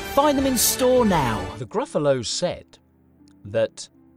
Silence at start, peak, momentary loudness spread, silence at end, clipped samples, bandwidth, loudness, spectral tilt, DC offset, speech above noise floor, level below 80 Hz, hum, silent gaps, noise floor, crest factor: 0 s; -4 dBFS; 11 LU; 0.3 s; under 0.1%; 16.5 kHz; -21 LUFS; -4 dB/octave; under 0.1%; 33 dB; -44 dBFS; none; none; -55 dBFS; 18 dB